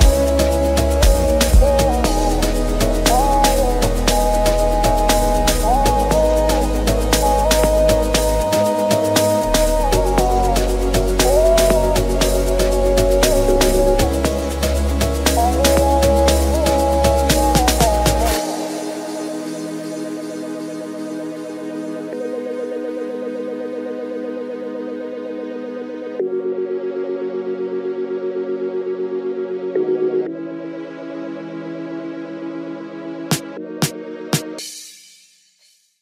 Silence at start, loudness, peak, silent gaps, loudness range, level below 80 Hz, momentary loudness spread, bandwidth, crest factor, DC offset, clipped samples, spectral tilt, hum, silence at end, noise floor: 0 s; -18 LUFS; 0 dBFS; none; 11 LU; -22 dBFS; 13 LU; 16.5 kHz; 16 dB; under 0.1%; under 0.1%; -4.5 dB/octave; none; 1.05 s; -57 dBFS